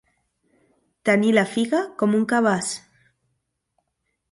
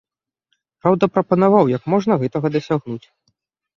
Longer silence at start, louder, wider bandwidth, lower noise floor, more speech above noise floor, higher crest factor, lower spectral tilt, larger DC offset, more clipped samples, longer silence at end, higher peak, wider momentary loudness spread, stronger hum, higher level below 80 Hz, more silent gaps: first, 1.05 s vs 0.85 s; second, -21 LUFS vs -18 LUFS; first, 11.5 kHz vs 7.2 kHz; first, -76 dBFS vs -72 dBFS; about the same, 56 dB vs 55 dB; about the same, 18 dB vs 18 dB; second, -5 dB/octave vs -8.5 dB/octave; neither; neither; first, 1.55 s vs 0.8 s; second, -6 dBFS vs -2 dBFS; about the same, 9 LU vs 9 LU; neither; second, -68 dBFS vs -58 dBFS; neither